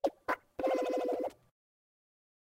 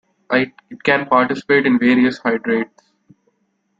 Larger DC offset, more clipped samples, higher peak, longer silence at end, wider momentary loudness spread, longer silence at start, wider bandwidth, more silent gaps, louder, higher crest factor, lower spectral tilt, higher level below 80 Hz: neither; neither; second, -18 dBFS vs -2 dBFS; about the same, 1.2 s vs 1.15 s; about the same, 6 LU vs 8 LU; second, 0.05 s vs 0.3 s; first, 16 kHz vs 7.6 kHz; neither; second, -35 LUFS vs -17 LUFS; about the same, 20 dB vs 18 dB; second, -4.5 dB/octave vs -6.5 dB/octave; second, -70 dBFS vs -60 dBFS